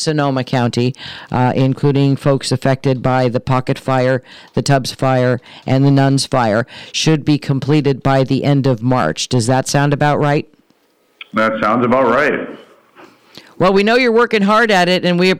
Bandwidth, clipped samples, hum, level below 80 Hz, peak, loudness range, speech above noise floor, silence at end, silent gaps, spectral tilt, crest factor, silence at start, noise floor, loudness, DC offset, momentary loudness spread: 14 kHz; under 0.1%; none; -46 dBFS; -4 dBFS; 2 LU; 43 dB; 0 s; none; -6 dB/octave; 10 dB; 0 s; -57 dBFS; -15 LUFS; under 0.1%; 7 LU